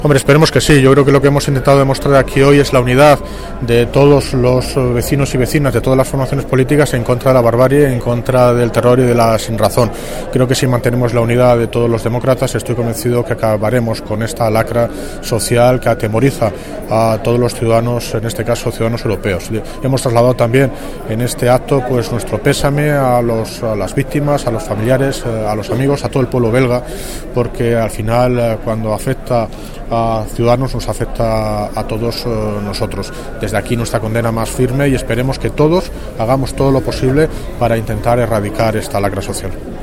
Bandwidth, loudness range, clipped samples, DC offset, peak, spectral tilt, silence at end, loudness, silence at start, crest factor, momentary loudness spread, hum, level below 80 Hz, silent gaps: 16.5 kHz; 6 LU; under 0.1%; 0.3%; 0 dBFS; -6 dB/octave; 0 s; -13 LUFS; 0 s; 12 dB; 9 LU; none; -28 dBFS; none